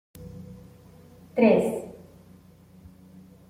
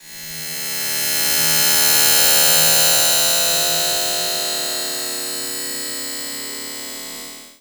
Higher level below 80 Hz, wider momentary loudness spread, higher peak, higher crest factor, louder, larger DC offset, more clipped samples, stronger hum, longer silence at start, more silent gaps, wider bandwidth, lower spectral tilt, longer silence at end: about the same, -60 dBFS vs -56 dBFS; first, 25 LU vs 17 LU; second, -6 dBFS vs 0 dBFS; about the same, 22 dB vs 18 dB; second, -23 LUFS vs -15 LUFS; neither; neither; neither; first, 0.2 s vs 0.05 s; neither; second, 15.5 kHz vs over 20 kHz; first, -7 dB/octave vs 0.5 dB/octave; first, 1.55 s vs 0.1 s